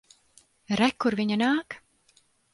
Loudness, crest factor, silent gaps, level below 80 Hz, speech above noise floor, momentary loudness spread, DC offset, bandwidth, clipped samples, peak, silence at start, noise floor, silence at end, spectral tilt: -26 LUFS; 18 dB; none; -64 dBFS; 40 dB; 15 LU; under 0.1%; 11.5 kHz; under 0.1%; -10 dBFS; 0.7 s; -65 dBFS; 0.75 s; -5 dB/octave